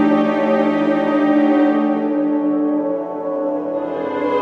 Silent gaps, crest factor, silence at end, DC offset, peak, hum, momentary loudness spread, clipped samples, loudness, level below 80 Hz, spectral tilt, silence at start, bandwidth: none; 12 dB; 0 s; under 0.1%; -4 dBFS; none; 8 LU; under 0.1%; -18 LUFS; -68 dBFS; -8 dB/octave; 0 s; 5.4 kHz